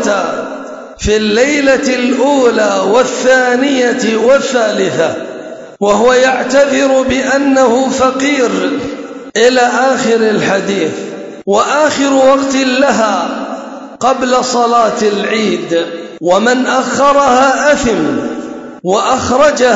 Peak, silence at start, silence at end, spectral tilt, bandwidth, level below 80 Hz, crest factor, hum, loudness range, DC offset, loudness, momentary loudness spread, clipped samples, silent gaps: 0 dBFS; 0 s; 0 s; -3.5 dB/octave; 8 kHz; -40 dBFS; 12 dB; none; 2 LU; under 0.1%; -11 LUFS; 12 LU; under 0.1%; none